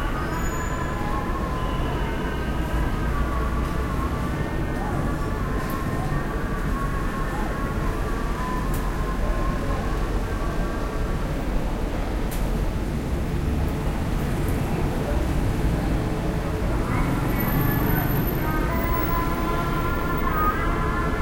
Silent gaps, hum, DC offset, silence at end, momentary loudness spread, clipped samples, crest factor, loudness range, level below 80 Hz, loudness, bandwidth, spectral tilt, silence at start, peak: none; none; under 0.1%; 0 s; 4 LU; under 0.1%; 14 dB; 4 LU; -28 dBFS; -26 LUFS; 16 kHz; -6.5 dB/octave; 0 s; -10 dBFS